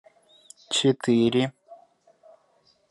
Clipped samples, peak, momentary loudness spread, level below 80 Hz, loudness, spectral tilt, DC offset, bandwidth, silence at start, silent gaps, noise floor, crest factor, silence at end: under 0.1%; -10 dBFS; 6 LU; -68 dBFS; -23 LUFS; -5 dB/octave; under 0.1%; 11.5 kHz; 0.7 s; none; -64 dBFS; 18 dB; 1.15 s